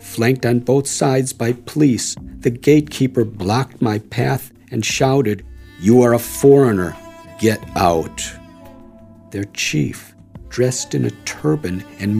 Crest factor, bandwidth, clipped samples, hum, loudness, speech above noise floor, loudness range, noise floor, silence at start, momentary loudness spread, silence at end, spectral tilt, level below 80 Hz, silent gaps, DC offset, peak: 18 dB; 15.5 kHz; under 0.1%; none; -17 LUFS; 25 dB; 6 LU; -42 dBFS; 0 s; 14 LU; 0 s; -5.5 dB/octave; -44 dBFS; none; under 0.1%; 0 dBFS